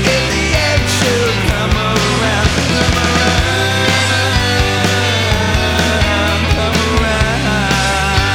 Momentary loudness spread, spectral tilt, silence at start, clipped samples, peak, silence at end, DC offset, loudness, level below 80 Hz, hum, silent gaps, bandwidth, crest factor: 2 LU; -4 dB/octave; 0 s; under 0.1%; 0 dBFS; 0 s; under 0.1%; -13 LUFS; -22 dBFS; none; none; 19.5 kHz; 12 dB